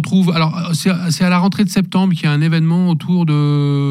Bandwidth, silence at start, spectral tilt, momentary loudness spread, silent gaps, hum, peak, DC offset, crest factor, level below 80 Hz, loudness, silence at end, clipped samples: 14.5 kHz; 0 s; -6.5 dB/octave; 3 LU; none; none; -4 dBFS; under 0.1%; 10 dB; -56 dBFS; -15 LUFS; 0 s; under 0.1%